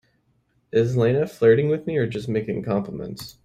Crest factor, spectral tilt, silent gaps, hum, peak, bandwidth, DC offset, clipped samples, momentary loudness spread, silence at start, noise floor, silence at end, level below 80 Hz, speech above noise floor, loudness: 18 dB; -7.5 dB/octave; none; none; -6 dBFS; 15 kHz; under 0.1%; under 0.1%; 11 LU; 0.75 s; -66 dBFS; 0.15 s; -56 dBFS; 45 dB; -22 LUFS